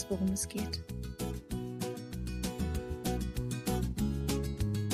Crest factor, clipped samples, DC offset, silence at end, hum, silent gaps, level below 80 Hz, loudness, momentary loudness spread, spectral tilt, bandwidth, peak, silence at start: 14 dB; under 0.1%; under 0.1%; 0 s; none; none; -42 dBFS; -36 LUFS; 7 LU; -5.5 dB/octave; 15.5 kHz; -20 dBFS; 0 s